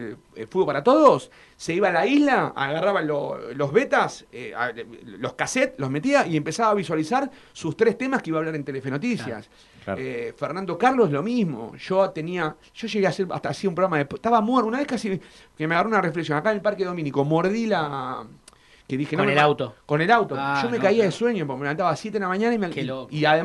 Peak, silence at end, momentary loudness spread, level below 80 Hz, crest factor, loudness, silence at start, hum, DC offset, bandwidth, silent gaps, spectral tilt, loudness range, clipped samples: -4 dBFS; 0 s; 12 LU; -62 dBFS; 20 dB; -23 LUFS; 0 s; none; under 0.1%; 12 kHz; none; -5.5 dB/octave; 4 LU; under 0.1%